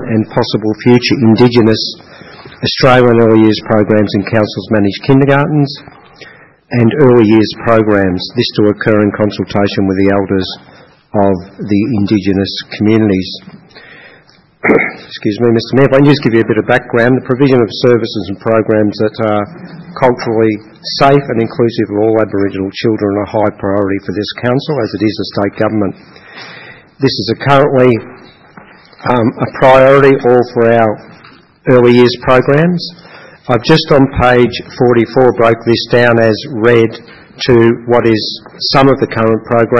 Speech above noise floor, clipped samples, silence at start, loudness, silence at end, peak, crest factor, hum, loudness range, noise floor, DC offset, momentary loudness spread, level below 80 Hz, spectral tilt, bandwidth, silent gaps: 34 dB; 0.8%; 0 s; -11 LUFS; 0 s; 0 dBFS; 10 dB; none; 5 LU; -44 dBFS; under 0.1%; 10 LU; -40 dBFS; -7.5 dB/octave; 7.8 kHz; none